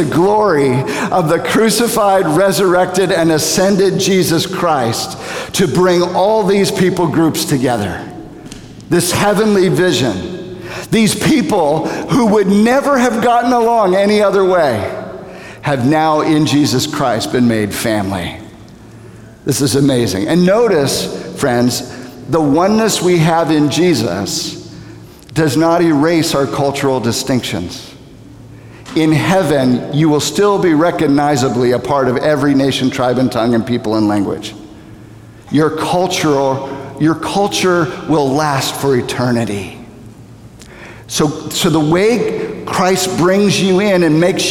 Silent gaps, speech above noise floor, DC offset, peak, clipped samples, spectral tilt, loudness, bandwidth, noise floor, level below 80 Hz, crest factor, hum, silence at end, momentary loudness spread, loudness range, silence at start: none; 24 dB; under 0.1%; 0 dBFS; under 0.1%; -5 dB/octave; -13 LUFS; 18.5 kHz; -36 dBFS; -44 dBFS; 12 dB; none; 0 s; 11 LU; 4 LU; 0 s